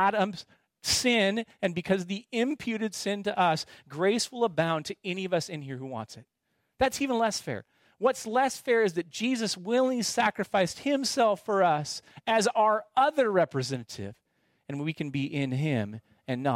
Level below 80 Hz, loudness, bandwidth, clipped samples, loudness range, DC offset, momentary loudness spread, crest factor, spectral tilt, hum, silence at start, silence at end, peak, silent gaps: -64 dBFS; -28 LUFS; 16 kHz; under 0.1%; 5 LU; under 0.1%; 12 LU; 18 dB; -4 dB/octave; none; 0 s; 0 s; -12 dBFS; none